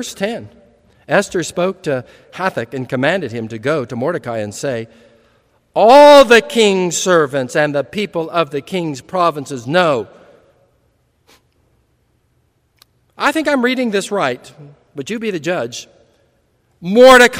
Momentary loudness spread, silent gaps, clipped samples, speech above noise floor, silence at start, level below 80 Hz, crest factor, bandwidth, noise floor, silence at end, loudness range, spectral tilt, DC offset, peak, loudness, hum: 18 LU; none; 0.8%; 47 dB; 0 s; -52 dBFS; 16 dB; 19 kHz; -61 dBFS; 0 s; 11 LU; -4 dB/octave; under 0.1%; 0 dBFS; -14 LUFS; none